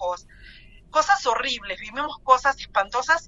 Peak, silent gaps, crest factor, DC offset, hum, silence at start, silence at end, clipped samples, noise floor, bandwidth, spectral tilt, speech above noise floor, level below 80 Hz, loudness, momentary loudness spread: -4 dBFS; none; 20 dB; under 0.1%; none; 0 s; 0 s; under 0.1%; -47 dBFS; 8 kHz; -1 dB/octave; 24 dB; -50 dBFS; -23 LUFS; 11 LU